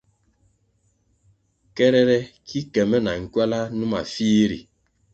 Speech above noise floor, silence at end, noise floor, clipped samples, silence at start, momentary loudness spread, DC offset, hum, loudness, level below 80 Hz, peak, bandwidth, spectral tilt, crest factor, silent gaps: 45 dB; 0.5 s; -66 dBFS; under 0.1%; 1.75 s; 13 LU; under 0.1%; none; -21 LUFS; -54 dBFS; -4 dBFS; 8 kHz; -6 dB/octave; 20 dB; none